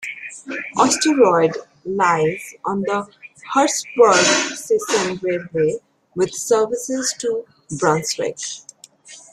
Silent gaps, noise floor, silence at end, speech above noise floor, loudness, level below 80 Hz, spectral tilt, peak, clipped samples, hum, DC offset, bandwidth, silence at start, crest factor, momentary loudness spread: none; -44 dBFS; 0.15 s; 26 dB; -19 LUFS; -62 dBFS; -3 dB/octave; -2 dBFS; under 0.1%; none; under 0.1%; 14.5 kHz; 0 s; 18 dB; 15 LU